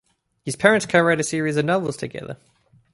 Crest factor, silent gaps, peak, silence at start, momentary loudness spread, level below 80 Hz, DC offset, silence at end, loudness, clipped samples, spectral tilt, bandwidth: 20 dB; none; -2 dBFS; 0.45 s; 18 LU; -58 dBFS; under 0.1%; 0.6 s; -20 LUFS; under 0.1%; -4.5 dB/octave; 11.5 kHz